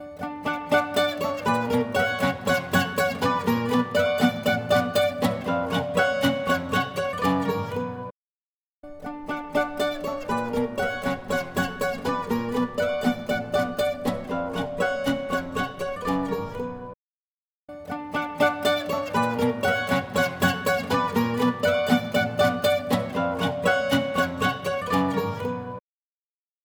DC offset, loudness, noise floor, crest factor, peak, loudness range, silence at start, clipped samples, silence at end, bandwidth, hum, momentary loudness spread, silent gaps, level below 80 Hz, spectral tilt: under 0.1%; -25 LUFS; under -90 dBFS; 20 dB; -6 dBFS; 6 LU; 0 s; under 0.1%; 0.85 s; over 20 kHz; none; 8 LU; 8.11-8.83 s, 16.96-17.68 s; -52 dBFS; -5 dB/octave